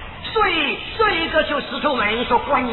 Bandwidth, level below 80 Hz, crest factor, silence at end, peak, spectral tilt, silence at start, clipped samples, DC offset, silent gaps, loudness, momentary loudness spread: 4.3 kHz; -40 dBFS; 14 dB; 0 s; -6 dBFS; -7 dB/octave; 0 s; under 0.1%; under 0.1%; none; -19 LUFS; 4 LU